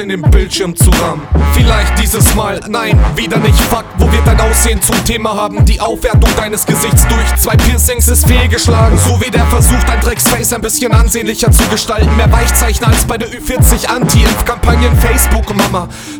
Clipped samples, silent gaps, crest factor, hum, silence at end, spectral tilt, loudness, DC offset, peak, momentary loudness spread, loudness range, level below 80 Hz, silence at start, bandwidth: 0.9%; none; 10 dB; none; 0 s; -4.5 dB/octave; -10 LUFS; under 0.1%; 0 dBFS; 4 LU; 2 LU; -12 dBFS; 0 s; over 20 kHz